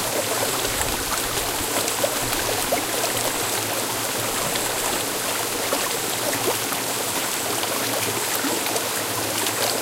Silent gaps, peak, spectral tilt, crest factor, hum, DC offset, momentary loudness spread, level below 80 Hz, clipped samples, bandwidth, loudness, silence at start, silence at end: none; -2 dBFS; -1.5 dB/octave; 22 dB; none; under 0.1%; 1 LU; -46 dBFS; under 0.1%; 17 kHz; -22 LUFS; 0 s; 0 s